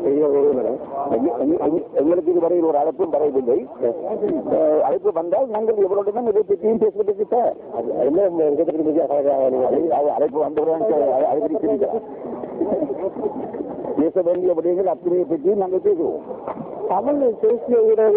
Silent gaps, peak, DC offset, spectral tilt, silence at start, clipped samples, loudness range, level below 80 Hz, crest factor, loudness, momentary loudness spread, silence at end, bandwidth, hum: none; -8 dBFS; under 0.1%; -12 dB/octave; 0 s; under 0.1%; 3 LU; -60 dBFS; 12 dB; -20 LUFS; 8 LU; 0 s; 3.6 kHz; none